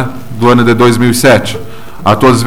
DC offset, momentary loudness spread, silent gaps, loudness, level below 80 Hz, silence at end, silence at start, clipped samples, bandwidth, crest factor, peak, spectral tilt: 8%; 13 LU; none; -8 LUFS; -36 dBFS; 0 s; 0 s; 0.3%; 17 kHz; 10 dB; 0 dBFS; -5.5 dB/octave